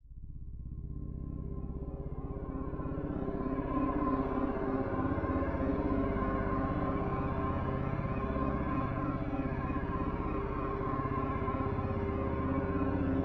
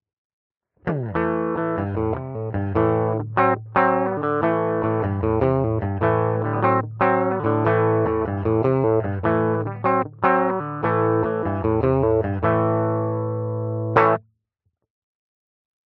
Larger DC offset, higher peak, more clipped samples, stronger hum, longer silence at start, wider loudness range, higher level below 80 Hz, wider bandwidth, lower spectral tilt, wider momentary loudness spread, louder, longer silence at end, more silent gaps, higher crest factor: neither; second, -18 dBFS vs -2 dBFS; neither; first, 50 Hz at -55 dBFS vs none; second, 0.05 s vs 0.85 s; about the same, 4 LU vs 3 LU; about the same, -42 dBFS vs -46 dBFS; first, 5.6 kHz vs 4.6 kHz; first, -10.5 dB/octave vs -8 dB/octave; first, 9 LU vs 6 LU; second, -35 LUFS vs -21 LUFS; second, 0 s vs 1.65 s; neither; about the same, 16 dB vs 20 dB